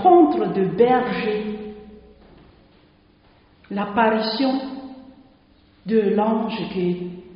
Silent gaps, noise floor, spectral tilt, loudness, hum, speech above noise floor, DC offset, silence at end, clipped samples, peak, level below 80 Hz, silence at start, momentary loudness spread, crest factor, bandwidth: none; -55 dBFS; -5 dB/octave; -21 LUFS; none; 34 dB; under 0.1%; 0 s; under 0.1%; -2 dBFS; -56 dBFS; 0 s; 17 LU; 20 dB; 5.4 kHz